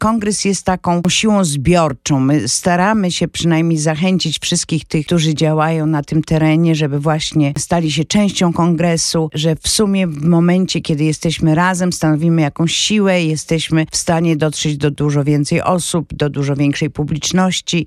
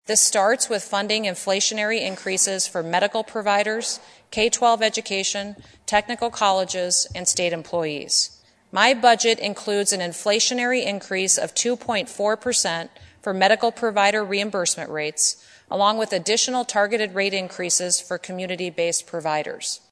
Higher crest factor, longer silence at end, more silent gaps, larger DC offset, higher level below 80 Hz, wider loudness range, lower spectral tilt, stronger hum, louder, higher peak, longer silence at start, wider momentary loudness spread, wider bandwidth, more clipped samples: second, 12 dB vs 22 dB; second, 0 s vs 0.15 s; neither; neither; first, -40 dBFS vs -62 dBFS; about the same, 2 LU vs 2 LU; first, -5 dB/octave vs -1.5 dB/octave; neither; first, -15 LUFS vs -21 LUFS; about the same, -2 dBFS vs -2 dBFS; about the same, 0 s vs 0.05 s; second, 4 LU vs 9 LU; first, 13 kHz vs 11 kHz; neither